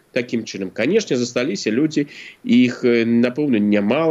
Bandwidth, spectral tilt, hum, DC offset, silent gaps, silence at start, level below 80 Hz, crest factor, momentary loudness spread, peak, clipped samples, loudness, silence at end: 8 kHz; -5.5 dB/octave; none; under 0.1%; none; 0.15 s; -68 dBFS; 14 dB; 9 LU; -4 dBFS; under 0.1%; -19 LUFS; 0 s